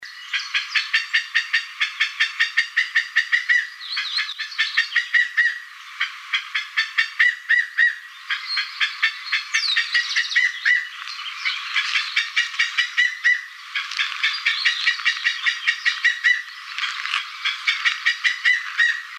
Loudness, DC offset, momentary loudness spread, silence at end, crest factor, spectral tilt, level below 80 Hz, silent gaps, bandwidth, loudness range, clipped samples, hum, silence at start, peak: -20 LUFS; under 0.1%; 8 LU; 0 s; 18 dB; 10 dB/octave; under -90 dBFS; none; 15.5 kHz; 1 LU; under 0.1%; none; 0 s; -4 dBFS